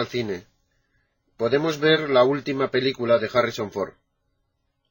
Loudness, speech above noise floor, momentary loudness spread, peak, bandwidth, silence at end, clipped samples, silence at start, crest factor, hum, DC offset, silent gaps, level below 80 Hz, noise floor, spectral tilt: -22 LUFS; 51 dB; 12 LU; -6 dBFS; 17 kHz; 1 s; under 0.1%; 0 s; 18 dB; none; under 0.1%; none; -62 dBFS; -73 dBFS; -5.5 dB/octave